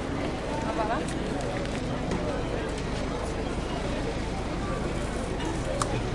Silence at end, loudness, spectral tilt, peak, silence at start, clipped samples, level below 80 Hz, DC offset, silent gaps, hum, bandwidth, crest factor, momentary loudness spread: 0 s; -31 LUFS; -5.5 dB/octave; -10 dBFS; 0 s; under 0.1%; -36 dBFS; under 0.1%; none; none; 11.5 kHz; 20 dB; 3 LU